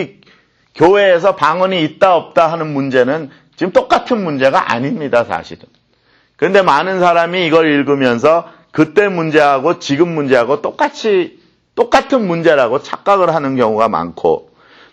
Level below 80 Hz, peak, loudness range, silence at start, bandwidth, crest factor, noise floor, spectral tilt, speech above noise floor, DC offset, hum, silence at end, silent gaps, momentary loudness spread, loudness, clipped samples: -52 dBFS; 0 dBFS; 3 LU; 0 s; 9.4 kHz; 14 dB; -55 dBFS; -6 dB/octave; 42 dB; under 0.1%; none; 0.5 s; none; 7 LU; -13 LUFS; under 0.1%